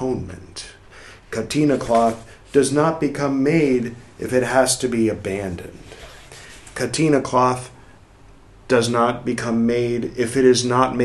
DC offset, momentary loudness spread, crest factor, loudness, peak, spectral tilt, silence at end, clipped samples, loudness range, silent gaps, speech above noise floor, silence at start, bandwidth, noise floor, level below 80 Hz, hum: under 0.1%; 20 LU; 18 dB; -19 LUFS; -2 dBFS; -5 dB/octave; 0 s; under 0.1%; 4 LU; none; 28 dB; 0 s; 12.5 kHz; -47 dBFS; -48 dBFS; none